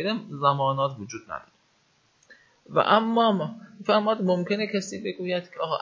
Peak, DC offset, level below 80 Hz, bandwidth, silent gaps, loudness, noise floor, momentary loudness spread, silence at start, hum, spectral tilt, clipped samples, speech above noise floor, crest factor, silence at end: -6 dBFS; under 0.1%; -70 dBFS; 7.8 kHz; none; -25 LUFS; -65 dBFS; 15 LU; 0 s; none; -5.5 dB/octave; under 0.1%; 40 dB; 20 dB; 0 s